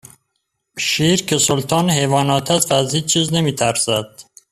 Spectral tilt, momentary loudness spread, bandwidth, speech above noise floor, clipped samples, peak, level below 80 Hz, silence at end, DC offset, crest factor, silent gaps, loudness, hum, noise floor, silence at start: -3.5 dB/octave; 5 LU; 15 kHz; 56 dB; under 0.1%; -2 dBFS; -52 dBFS; 0.3 s; under 0.1%; 16 dB; none; -16 LUFS; none; -73 dBFS; 0.75 s